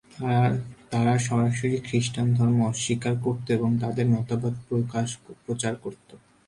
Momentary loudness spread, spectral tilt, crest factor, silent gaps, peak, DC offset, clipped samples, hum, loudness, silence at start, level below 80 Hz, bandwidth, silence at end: 8 LU; -6 dB/octave; 14 dB; none; -10 dBFS; under 0.1%; under 0.1%; none; -25 LUFS; 0.15 s; -56 dBFS; 11.5 kHz; 0.3 s